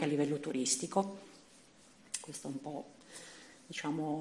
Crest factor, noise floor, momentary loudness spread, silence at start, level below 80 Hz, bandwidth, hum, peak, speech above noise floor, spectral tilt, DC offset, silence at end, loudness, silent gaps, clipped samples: 20 dB; -62 dBFS; 19 LU; 0 s; -80 dBFS; 12 kHz; none; -18 dBFS; 25 dB; -4 dB/octave; under 0.1%; 0 s; -37 LUFS; none; under 0.1%